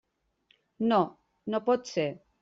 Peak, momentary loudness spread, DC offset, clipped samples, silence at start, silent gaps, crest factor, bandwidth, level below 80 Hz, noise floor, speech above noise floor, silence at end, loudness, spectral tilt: -12 dBFS; 8 LU; under 0.1%; under 0.1%; 0.8 s; none; 18 dB; 7.6 kHz; -72 dBFS; -70 dBFS; 42 dB; 0.25 s; -29 LUFS; -5 dB/octave